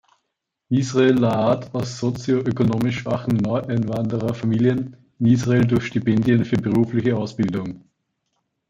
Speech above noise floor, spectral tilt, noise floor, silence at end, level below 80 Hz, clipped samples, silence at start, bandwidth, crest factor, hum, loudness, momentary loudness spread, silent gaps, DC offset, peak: 59 dB; -7.5 dB/octave; -78 dBFS; 0.9 s; -52 dBFS; under 0.1%; 0.7 s; 7.8 kHz; 16 dB; none; -21 LUFS; 7 LU; none; under 0.1%; -4 dBFS